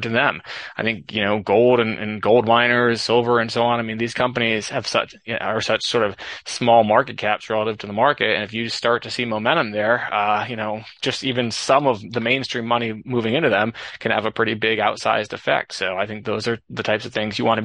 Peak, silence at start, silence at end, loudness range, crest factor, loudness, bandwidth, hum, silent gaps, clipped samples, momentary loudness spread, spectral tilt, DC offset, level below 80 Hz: -2 dBFS; 0 s; 0 s; 3 LU; 18 dB; -20 LUFS; 11 kHz; none; none; under 0.1%; 9 LU; -4.5 dB/octave; under 0.1%; -60 dBFS